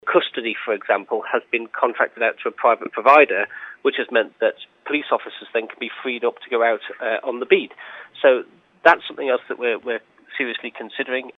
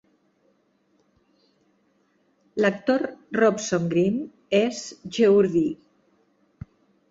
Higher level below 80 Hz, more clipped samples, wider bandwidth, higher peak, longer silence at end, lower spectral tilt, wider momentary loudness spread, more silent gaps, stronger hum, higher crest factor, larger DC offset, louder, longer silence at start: second, -78 dBFS vs -62 dBFS; neither; second, 6.6 kHz vs 8 kHz; first, 0 dBFS vs -6 dBFS; second, 0.05 s vs 1.35 s; about the same, -5 dB/octave vs -5.5 dB/octave; second, 12 LU vs 22 LU; neither; neither; about the same, 20 dB vs 18 dB; neither; about the same, -21 LUFS vs -23 LUFS; second, 0.05 s vs 2.55 s